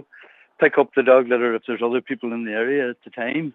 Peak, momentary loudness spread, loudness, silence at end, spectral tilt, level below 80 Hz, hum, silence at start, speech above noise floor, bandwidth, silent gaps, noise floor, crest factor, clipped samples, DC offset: -2 dBFS; 11 LU; -20 LUFS; 0.05 s; -8 dB/octave; -82 dBFS; none; 0.6 s; 29 dB; 4 kHz; none; -49 dBFS; 18 dB; under 0.1%; under 0.1%